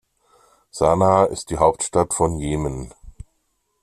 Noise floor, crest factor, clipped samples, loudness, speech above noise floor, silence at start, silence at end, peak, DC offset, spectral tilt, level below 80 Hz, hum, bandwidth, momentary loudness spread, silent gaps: -70 dBFS; 18 dB; under 0.1%; -19 LUFS; 51 dB; 0.75 s; 0.7 s; -2 dBFS; under 0.1%; -5.5 dB/octave; -40 dBFS; none; 14 kHz; 16 LU; none